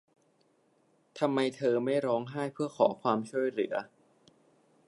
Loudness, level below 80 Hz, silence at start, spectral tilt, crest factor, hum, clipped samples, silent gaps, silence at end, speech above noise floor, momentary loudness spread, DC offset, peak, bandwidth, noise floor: -31 LUFS; -84 dBFS; 1.15 s; -6.5 dB/octave; 22 dB; none; under 0.1%; none; 1 s; 39 dB; 8 LU; under 0.1%; -10 dBFS; 11.5 kHz; -70 dBFS